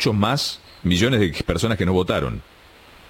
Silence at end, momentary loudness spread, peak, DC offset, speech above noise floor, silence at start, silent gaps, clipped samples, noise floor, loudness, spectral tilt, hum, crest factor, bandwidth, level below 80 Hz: 0.7 s; 9 LU; -4 dBFS; under 0.1%; 27 dB; 0 s; none; under 0.1%; -47 dBFS; -21 LUFS; -5.5 dB/octave; none; 18 dB; 17 kHz; -40 dBFS